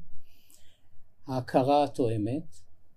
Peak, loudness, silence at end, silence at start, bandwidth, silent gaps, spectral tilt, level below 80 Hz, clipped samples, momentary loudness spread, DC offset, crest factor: -10 dBFS; -28 LUFS; 0 s; 0 s; 14.5 kHz; none; -7.5 dB/octave; -54 dBFS; under 0.1%; 12 LU; under 0.1%; 20 dB